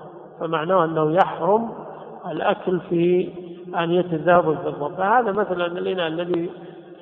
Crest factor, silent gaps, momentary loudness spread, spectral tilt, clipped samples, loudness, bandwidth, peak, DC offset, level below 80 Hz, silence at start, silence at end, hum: 22 dB; none; 15 LU; -9 dB/octave; under 0.1%; -22 LUFS; 4.1 kHz; 0 dBFS; under 0.1%; -62 dBFS; 0 s; 0.05 s; none